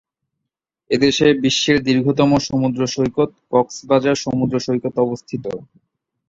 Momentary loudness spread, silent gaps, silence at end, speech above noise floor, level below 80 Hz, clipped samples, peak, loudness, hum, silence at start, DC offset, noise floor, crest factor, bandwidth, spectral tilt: 8 LU; none; 0.65 s; 63 dB; -50 dBFS; under 0.1%; -2 dBFS; -18 LUFS; none; 0.9 s; under 0.1%; -81 dBFS; 18 dB; 7.8 kHz; -5 dB/octave